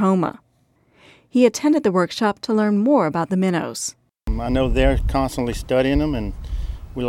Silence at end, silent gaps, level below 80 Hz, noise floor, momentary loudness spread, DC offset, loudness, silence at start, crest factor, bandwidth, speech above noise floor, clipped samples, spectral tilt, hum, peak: 0 s; none; -30 dBFS; -61 dBFS; 12 LU; under 0.1%; -20 LUFS; 0 s; 18 dB; 16 kHz; 42 dB; under 0.1%; -6 dB/octave; none; -2 dBFS